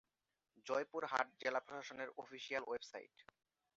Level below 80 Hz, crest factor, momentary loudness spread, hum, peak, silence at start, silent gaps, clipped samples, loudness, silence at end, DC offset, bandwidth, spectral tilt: -86 dBFS; 24 dB; 14 LU; none; -22 dBFS; 0.55 s; none; under 0.1%; -44 LUFS; 0.55 s; under 0.1%; 7.6 kHz; -0.5 dB/octave